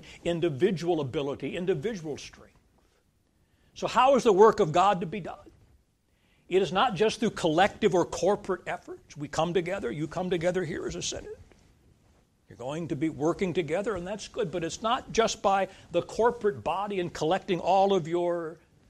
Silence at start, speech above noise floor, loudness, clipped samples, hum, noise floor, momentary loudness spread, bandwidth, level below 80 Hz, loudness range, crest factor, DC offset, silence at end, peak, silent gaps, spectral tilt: 0 s; 41 dB; -27 LUFS; under 0.1%; none; -68 dBFS; 13 LU; 12.5 kHz; -56 dBFS; 7 LU; 22 dB; under 0.1%; 0.35 s; -6 dBFS; none; -5 dB/octave